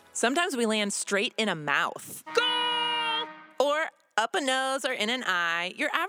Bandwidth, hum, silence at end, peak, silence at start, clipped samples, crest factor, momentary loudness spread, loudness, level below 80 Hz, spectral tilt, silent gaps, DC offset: over 20 kHz; none; 0 s; -8 dBFS; 0.15 s; under 0.1%; 20 dB; 4 LU; -27 LUFS; -88 dBFS; -2 dB/octave; none; under 0.1%